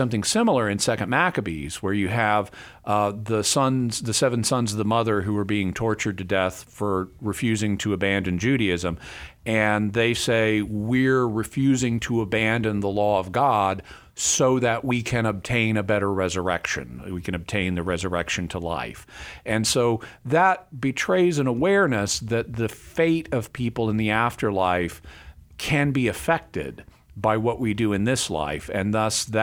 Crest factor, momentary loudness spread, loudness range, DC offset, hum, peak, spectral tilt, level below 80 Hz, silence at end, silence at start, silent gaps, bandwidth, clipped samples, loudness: 18 dB; 9 LU; 3 LU; under 0.1%; none; -6 dBFS; -4.5 dB/octave; -48 dBFS; 0 s; 0 s; none; 19 kHz; under 0.1%; -23 LUFS